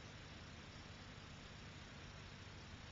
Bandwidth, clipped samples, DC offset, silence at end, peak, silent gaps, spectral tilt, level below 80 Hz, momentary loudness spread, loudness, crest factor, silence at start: 7.4 kHz; under 0.1%; under 0.1%; 0 s; -42 dBFS; none; -3.5 dB/octave; -64 dBFS; 0 LU; -55 LUFS; 14 dB; 0 s